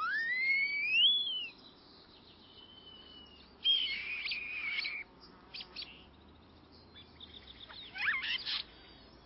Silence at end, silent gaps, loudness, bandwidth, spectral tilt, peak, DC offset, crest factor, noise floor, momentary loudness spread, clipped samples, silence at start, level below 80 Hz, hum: 0.05 s; none; -31 LUFS; 5.8 kHz; -3.5 dB/octave; -20 dBFS; under 0.1%; 18 dB; -59 dBFS; 25 LU; under 0.1%; 0 s; -68 dBFS; none